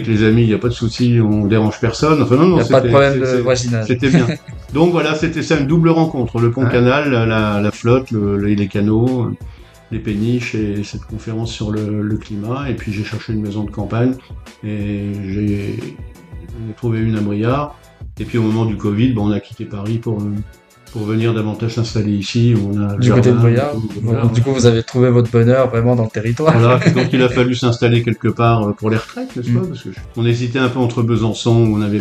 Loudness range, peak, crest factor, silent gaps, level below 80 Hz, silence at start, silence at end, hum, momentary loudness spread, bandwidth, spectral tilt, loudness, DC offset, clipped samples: 8 LU; 0 dBFS; 16 dB; none; -38 dBFS; 0 s; 0 s; none; 13 LU; 8.8 kHz; -7 dB/octave; -16 LUFS; under 0.1%; under 0.1%